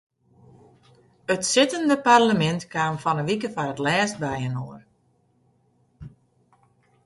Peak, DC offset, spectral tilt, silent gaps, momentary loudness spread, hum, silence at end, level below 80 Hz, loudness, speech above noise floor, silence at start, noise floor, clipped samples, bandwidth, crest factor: -4 dBFS; under 0.1%; -4 dB/octave; none; 12 LU; none; 0.95 s; -60 dBFS; -22 LUFS; 43 dB; 1.3 s; -65 dBFS; under 0.1%; 11.5 kHz; 20 dB